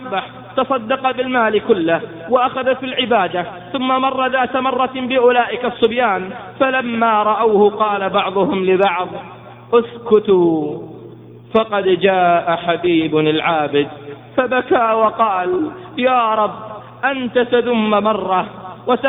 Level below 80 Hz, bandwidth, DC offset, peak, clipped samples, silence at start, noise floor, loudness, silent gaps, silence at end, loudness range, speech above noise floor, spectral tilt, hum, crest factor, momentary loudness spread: -56 dBFS; 4 kHz; under 0.1%; 0 dBFS; under 0.1%; 0 s; -37 dBFS; -16 LUFS; none; 0 s; 2 LU; 21 dB; -9 dB/octave; none; 16 dB; 10 LU